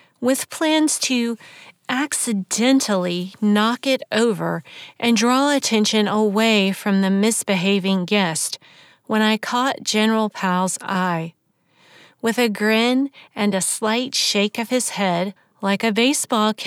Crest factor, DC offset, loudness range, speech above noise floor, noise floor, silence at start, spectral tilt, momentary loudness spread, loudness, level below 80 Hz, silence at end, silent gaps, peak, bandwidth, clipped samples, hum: 16 dB; under 0.1%; 3 LU; 40 dB; -60 dBFS; 0.2 s; -3.5 dB/octave; 8 LU; -19 LUFS; -84 dBFS; 0 s; none; -4 dBFS; 16.5 kHz; under 0.1%; none